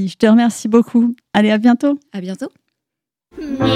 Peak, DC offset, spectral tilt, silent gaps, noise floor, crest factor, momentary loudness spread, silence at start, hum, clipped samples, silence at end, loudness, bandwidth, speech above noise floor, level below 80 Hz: 0 dBFS; under 0.1%; -6 dB/octave; none; -83 dBFS; 16 dB; 15 LU; 0 s; none; under 0.1%; 0 s; -15 LUFS; 12 kHz; 69 dB; -52 dBFS